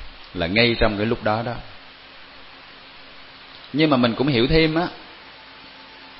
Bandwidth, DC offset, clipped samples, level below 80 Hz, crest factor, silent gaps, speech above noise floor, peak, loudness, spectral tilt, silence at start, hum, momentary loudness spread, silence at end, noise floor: 5.8 kHz; under 0.1%; under 0.1%; -38 dBFS; 20 dB; none; 24 dB; -2 dBFS; -20 LUFS; -10.5 dB/octave; 0 s; 50 Hz at -55 dBFS; 24 LU; 0 s; -43 dBFS